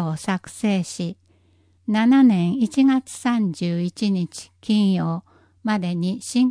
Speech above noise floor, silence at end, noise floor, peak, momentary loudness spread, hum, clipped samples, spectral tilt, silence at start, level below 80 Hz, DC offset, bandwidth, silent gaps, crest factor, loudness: 39 dB; 0 s; -59 dBFS; -6 dBFS; 14 LU; none; under 0.1%; -6 dB/octave; 0 s; -64 dBFS; under 0.1%; 10.5 kHz; none; 14 dB; -21 LUFS